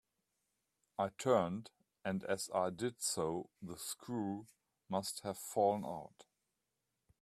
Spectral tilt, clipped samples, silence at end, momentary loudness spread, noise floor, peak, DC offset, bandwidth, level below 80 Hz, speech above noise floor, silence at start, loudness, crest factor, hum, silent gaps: -4.5 dB/octave; under 0.1%; 1 s; 13 LU; -88 dBFS; -18 dBFS; under 0.1%; 15.5 kHz; -78 dBFS; 49 dB; 1 s; -39 LUFS; 22 dB; none; none